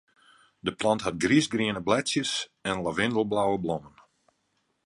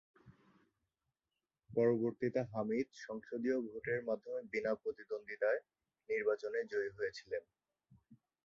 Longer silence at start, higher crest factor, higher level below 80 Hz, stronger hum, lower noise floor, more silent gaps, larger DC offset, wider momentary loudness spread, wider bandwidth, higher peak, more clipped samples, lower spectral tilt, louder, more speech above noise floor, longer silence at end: first, 0.65 s vs 0.25 s; about the same, 20 dB vs 20 dB; first, -58 dBFS vs -78 dBFS; neither; second, -74 dBFS vs under -90 dBFS; neither; neither; about the same, 9 LU vs 10 LU; first, 11.5 kHz vs 7.4 kHz; first, -8 dBFS vs -20 dBFS; neither; second, -4 dB/octave vs -5.5 dB/octave; first, -27 LUFS vs -39 LUFS; second, 48 dB vs over 52 dB; first, 0.95 s vs 0.3 s